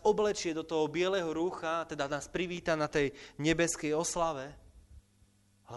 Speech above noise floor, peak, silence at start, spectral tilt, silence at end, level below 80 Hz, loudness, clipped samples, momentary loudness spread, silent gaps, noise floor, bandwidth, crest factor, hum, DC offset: 34 dB; -16 dBFS; 0 s; -4 dB/octave; 0 s; -56 dBFS; -33 LUFS; under 0.1%; 6 LU; none; -67 dBFS; 11.5 kHz; 18 dB; none; under 0.1%